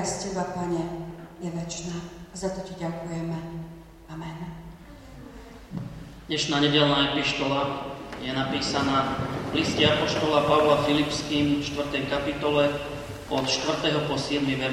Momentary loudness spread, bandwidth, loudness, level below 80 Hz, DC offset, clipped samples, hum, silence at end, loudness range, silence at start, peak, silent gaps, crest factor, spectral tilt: 18 LU; 15.5 kHz; -25 LUFS; -48 dBFS; under 0.1%; under 0.1%; none; 0 s; 12 LU; 0 s; -8 dBFS; none; 20 dB; -4.5 dB/octave